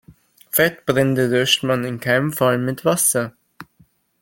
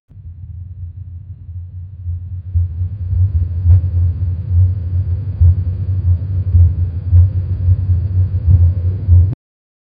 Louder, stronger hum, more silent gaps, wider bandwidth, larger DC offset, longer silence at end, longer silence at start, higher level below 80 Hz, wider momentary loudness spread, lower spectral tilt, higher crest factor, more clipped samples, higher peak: second, -18 LUFS vs -15 LUFS; neither; neither; first, 17 kHz vs 1.1 kHz; neither; about the same, 0.6 s vs 0.65 s; about the same, 0.1 s vs 0.15 s; second, -56 dBFS vs -22 dBFS; second, 5 LU vs 19 LU; second, -3.5 dB/octave vs -14 dB/octave; about the same, 18 dB vs 14 dB; neither; about the same, -2 dBFS vs 0 dBFS